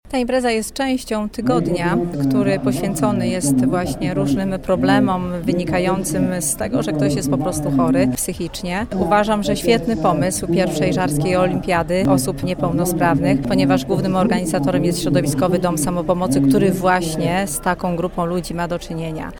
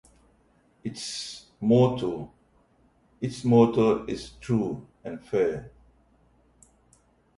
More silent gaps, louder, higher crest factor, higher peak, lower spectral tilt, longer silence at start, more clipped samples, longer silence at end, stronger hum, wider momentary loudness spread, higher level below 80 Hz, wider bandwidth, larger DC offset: neither; first, -18 LUFS vs -26 LUFS; second, 16 dB vs 22 dB; first, -2 dBFS vs -6 dBFS; second, -5.5 dB/octave vs -7 dB/octave; second, 0.05 s vs 0.85 s; neither; second, 0 s vs 1.7 s; neither; second, 5 LU vs 18 LU; first, -38 dBFS vs -56 dBFS; first, 18 kHz vs 11.5 kHz; neither